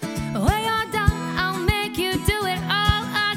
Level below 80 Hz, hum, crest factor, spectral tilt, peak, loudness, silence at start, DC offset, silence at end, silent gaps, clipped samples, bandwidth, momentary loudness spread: -32 dBFS; none; 18 dB; -4.5 dB/octave; -4 dBFS; -22 LUFS; 0 s; under 0.1%; 0 s; none; under 0.1%; 17.5 kHz; 3 LU